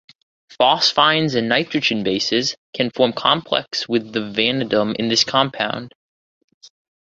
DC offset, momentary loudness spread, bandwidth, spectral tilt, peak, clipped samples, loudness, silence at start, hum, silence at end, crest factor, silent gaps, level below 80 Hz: under 0.1%; 9 LU; 7.8 kHz; -3.5 dB/octave; -2 dBFS; under 0.1%; -18 LUFS; 0.5 s; none; 0.35 s; 18 dB; 2.58-2.73 s, 5.95-6.48 s, 6.54-6.61 s; -60 dBFS